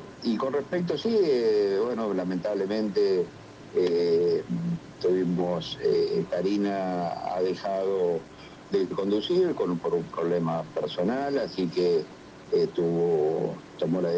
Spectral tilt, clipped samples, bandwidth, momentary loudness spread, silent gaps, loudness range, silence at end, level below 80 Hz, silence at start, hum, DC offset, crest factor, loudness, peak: -7 dB/octave; under 0.1%; 8 kHz; 7 LU; none; 2 LU; 0 s; -62 dBFS; 0 s; none; under 0.1%; 12 dB; -27 LUFS; -14 dBFS